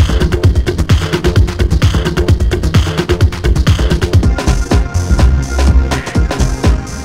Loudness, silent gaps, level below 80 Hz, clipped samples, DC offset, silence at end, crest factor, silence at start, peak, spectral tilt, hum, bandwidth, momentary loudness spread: -13 LUFS; none; -14 dBFS; 0.4%; under 0.1%; 0 s; 10 dB; 0 s; 0 dBFS; -6 dB/octave; none; 15 kHz; 3 LU